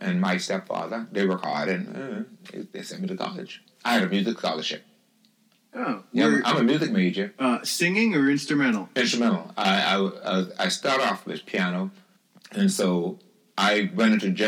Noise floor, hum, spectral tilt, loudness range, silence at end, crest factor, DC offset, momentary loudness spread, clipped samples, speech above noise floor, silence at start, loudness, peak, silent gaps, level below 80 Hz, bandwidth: -63 dBFS; none; -4.5 dB/octave; 6 LU; 0 s; 18 dB; under 0.1%; 14 LU; under 0.1%; 39 dB; 0 s; -24 LUFS; -6 dBFS; none; under -90 dBFS; 18.5 kHz